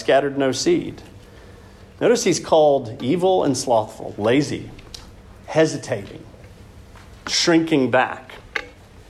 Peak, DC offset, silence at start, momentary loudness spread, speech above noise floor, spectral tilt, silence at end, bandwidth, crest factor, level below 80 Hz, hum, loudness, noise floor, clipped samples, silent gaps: -4 dBFS; under 0.1%; 0 s; 19 LU; 24 dB; -4.5 dB/octave; 0.4 s; 13.5 kHz; 16 dB; -50 dBFS; none; -20 LUFS; -44 dBFS; under 0.1%; none